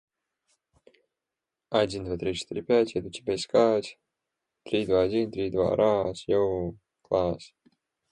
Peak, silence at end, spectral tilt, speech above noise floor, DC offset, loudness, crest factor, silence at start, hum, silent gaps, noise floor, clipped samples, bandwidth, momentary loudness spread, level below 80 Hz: -10 dBFS; 0.65 s; -6 dB/octave; 62 dB; under 0.1%; -27 LUFS; 18 dB; 1.7 s; none; none; -88 dBFS; under 0.1%; 11 kHz; 9 LU; -54 dBFS